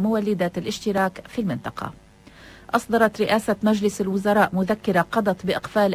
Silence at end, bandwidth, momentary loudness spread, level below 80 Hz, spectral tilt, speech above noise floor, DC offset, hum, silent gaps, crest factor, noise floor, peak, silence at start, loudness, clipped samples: 0 s; 16 kHz; 8 LU; -52 dBFS; -6 dB/octave; 25 dB; under 0.1%; none; none; 18 dB; -47 dBFS; -4 dBFS; 0 s; -22 LUFS; under 0.1%